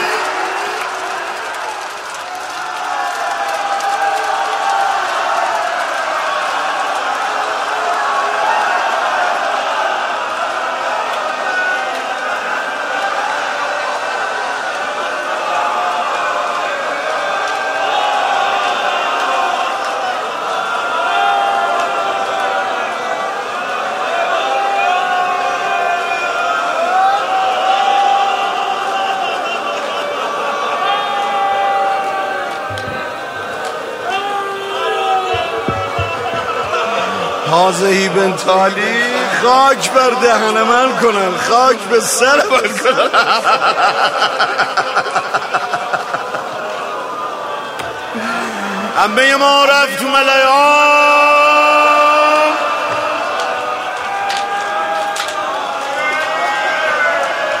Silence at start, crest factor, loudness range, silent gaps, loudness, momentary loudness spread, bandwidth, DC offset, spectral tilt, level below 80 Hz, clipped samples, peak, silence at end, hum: 0 s; 16 dB; 7 LU; none; -15 LUFS; 10 LU; 16 kHz; under 0.1%; -2.5 dB/octave; -56 dBFS; under 0.1%; 0 dBFS; 0 s; none